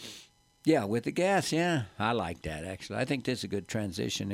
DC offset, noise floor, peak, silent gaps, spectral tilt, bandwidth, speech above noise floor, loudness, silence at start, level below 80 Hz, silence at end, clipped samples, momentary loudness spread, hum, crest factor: under 0.1%; -56 dBFS; -12 dBFS; none; -5 dB/octave; 16 kHz; 26 dB; -31 LUFS; 0 s; -58 dBFS; 0 s; under 0.1%; 11 LU; none; 18 dB